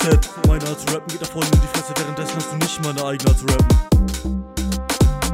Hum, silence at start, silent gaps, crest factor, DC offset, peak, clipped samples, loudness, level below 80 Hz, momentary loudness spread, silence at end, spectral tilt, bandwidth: none; 0 s; none; 16 dB; under 0.1%; -2 dBFS; under 0.1%; -20 LUFS; -22 dBFS; 9 LU; 0 s; -5 dB/octave; 16.5 kHz